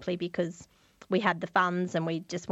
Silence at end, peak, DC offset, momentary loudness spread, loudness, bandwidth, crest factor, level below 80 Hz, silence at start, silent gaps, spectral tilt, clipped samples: 0 s; -10 dBFS; under 0.1%; 8 LU; -30 LUFS; 8.2 kHz; 22 dB; -68 dBFS; 0 s; none; -5.5 dB/octave; under 0.1%